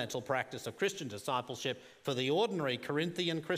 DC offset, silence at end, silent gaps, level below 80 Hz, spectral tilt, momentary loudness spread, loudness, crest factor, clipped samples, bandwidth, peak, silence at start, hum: under 0.1%; 0 s; none; -80 dBFS; -4.5 dB/octave; 7 LU; -35 LUFS; 18 dB; under 0.1%; 15.5 kHz; -18 dBFS; 0 s; none